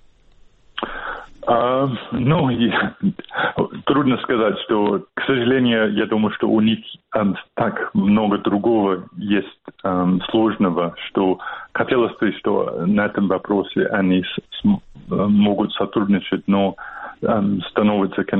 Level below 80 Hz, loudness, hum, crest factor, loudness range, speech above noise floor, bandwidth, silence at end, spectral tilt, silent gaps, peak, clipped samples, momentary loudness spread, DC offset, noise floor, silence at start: -50 dBFS; -20 LUFS; none; 16 dB; 2 LU; 31 dB; 4.1 kHz; 0 s; -10 dB/octave; none; -2 dBFS; under 0.1%; 8 LU; under 0.1%; -50 dBFS; 0.75 s